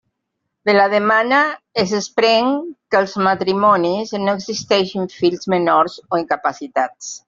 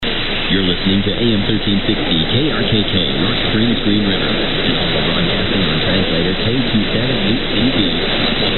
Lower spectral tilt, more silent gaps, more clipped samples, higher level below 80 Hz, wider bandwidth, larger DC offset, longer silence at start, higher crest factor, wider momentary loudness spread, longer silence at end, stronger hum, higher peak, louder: second, -4.5 dB/octave vs -9 dB/octave; neither; neither; second, -60 dBFS vs -26 dBFS; first, 7.6 kHz vs 4.3 kHz; neither; first, 0.65 s vs 0 s; about the same, 16 dB vs 14 dB; first, 8 LU vs 1 LU; about the same, 0.1 s vs 0 s; neither; about the same, -2 dBFS vs -2 dBFS; about the same, -17 LUFS vs -15 LUFS